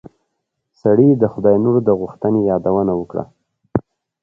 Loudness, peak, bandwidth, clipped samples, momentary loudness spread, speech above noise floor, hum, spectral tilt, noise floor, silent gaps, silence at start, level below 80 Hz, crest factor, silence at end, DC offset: -16 LUFS; 0 dBFS; 5.6 kHz; under 0.1%; 11 LU; 59 dB; none; -12 dB/octave; -74 dBFS; none; 0.85 s; -48 dBFS; 16 dB; 0.4 s; under 0.1%